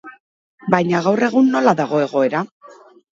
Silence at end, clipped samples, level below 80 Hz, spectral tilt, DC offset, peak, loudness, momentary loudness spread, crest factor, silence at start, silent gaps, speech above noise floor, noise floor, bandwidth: 0.4 s; under 0.1%; -64 dBFS; -6.5 dB/octave; under 0.1%; 0 dBFS; -17 LUFS; 10 LU; 18 dB; 0.05 s; 0.20-0.58 s, 2.51-2.60 s; 29 dB; -45 dBFS; 7.6 kHz